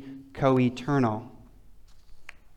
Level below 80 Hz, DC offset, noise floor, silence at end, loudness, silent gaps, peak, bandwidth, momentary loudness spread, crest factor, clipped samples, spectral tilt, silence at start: -52 dBFS; under 0.1%; -49 dBFS; 0.05 s; -26 LUFS; none; -10 dBFS; 9.2 kHz; 19 LU; 18 dB; under 0.1%; -8 dB/octave; 0 s